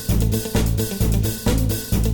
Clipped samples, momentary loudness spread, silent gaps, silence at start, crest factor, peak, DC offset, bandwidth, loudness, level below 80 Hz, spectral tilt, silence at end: under 0.1%; 1 LU; none; 0 s; 12 dB; -8 dBFS; under 0.1%; 19.5 kHz; -21 LUFS; -24 dBFS; -5.5 dB/octave; 0 s